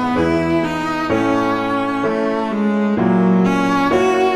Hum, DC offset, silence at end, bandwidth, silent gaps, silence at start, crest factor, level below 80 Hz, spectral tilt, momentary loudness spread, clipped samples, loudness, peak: none; under 0.1%; 0 s; 13 kHz; none; 0 s; 12 dB; -44 dBFS; -7 dB/octave; 4 LU; under 0.1%; -17 LUFS; -4 dBFS